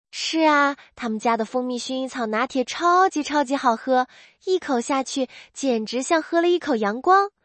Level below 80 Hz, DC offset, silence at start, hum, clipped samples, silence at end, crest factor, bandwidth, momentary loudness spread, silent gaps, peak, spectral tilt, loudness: -68 dBFS; under 0.1%; 0.15 s; none; under 0.1%; 0.15 s; 18 dB; 8.8 kHz; 10 LU; none; -4 dBFS; -3 dB/octave; -22 LUFS